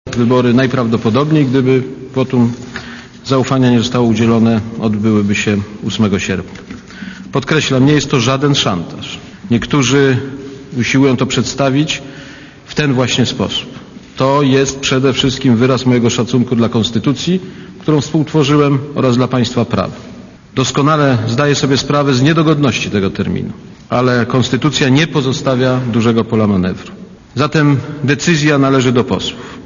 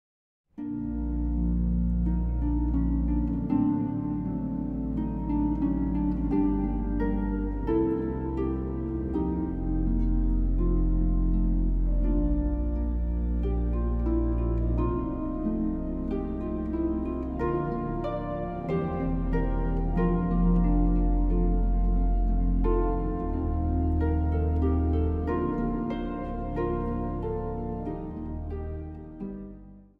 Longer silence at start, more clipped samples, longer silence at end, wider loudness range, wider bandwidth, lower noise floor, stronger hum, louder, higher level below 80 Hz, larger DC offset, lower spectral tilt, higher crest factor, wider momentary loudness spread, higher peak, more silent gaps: second, 0.05 s vs 0.55 s; neither; second, 0 s vs 0.15 s; about the same, 2 LU vs 4 LU; first, 7.4 kHz vs 3.4 kHz; second, -34 dBFS vs -47 dBFS; neither; first, -13 LUFS vs -29 LUFS; second, -42 dBFS vs -30 dBFS; neither; second, -5.5 dB/octave vs -11.5 dB/octave; about the same, 12 dB vs 14 dB; first, 15 LU vs 7 LU; first, 0 dBFS vs -14 dBFS; neither